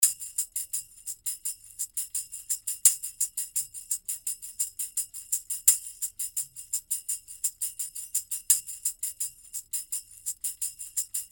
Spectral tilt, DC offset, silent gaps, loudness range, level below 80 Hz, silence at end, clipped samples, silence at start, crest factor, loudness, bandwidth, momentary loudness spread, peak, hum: 4 dB/octave; under 0.1%; none; 2 LU; -68 dBFS; 0.05 s; under 0.1%; 0 s; 30 dB; -29 LUFS; over 20 kHz; 12 LU; -2 dBFS; none